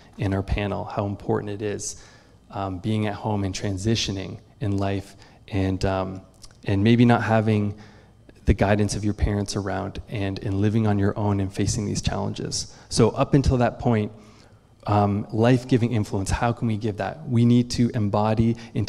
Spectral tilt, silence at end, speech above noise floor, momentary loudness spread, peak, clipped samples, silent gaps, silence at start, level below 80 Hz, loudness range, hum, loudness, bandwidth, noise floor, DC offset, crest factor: -6 dB/octave; 0 s; 29 dB; 11 LU; -4 dBFS; under 0.1%; none; 0.2 s; -38 dBFS; 5 LU; none; -24 LUFS; 12 kHz; -52 dBFS; under 0.1%; 18 dB